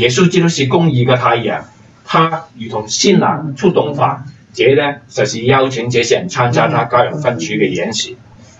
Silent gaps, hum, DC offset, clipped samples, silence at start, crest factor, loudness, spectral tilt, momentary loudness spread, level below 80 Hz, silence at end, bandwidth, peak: none; none; under 0.1%; under 0.1%; 0 s; 14 dB; -14 LUFS; -5 dB/octave; 9 LU; -52 dBFS; 0.45 s; 8.2 kHz; 0 dBFS